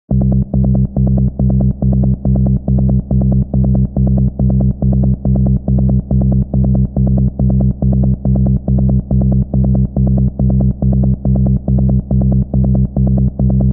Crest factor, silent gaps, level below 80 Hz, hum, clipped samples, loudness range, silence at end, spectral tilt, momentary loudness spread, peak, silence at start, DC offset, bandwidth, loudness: 10 dB; none; -18 dBFS; none; under 0.1%; 0 LU; 0 s; -18.5 dB/octave; 0 LU; -2 dBFS; 0.1 s; under 0.1%; 1.3 kHz; -13 LUFS